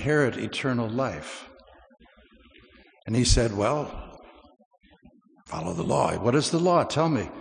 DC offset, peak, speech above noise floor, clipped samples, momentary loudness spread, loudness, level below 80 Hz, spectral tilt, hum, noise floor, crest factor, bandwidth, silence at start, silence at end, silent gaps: under 0.1%; -6 dBFS; 32 dB; under 0.1%; 16 LU; -25 LUFS; -38 dBFS; -5 dB/octave; none; -57 dBFS; 20 dB; 10.5 kHz; 0 s; 0 s; 4.65-4.71 s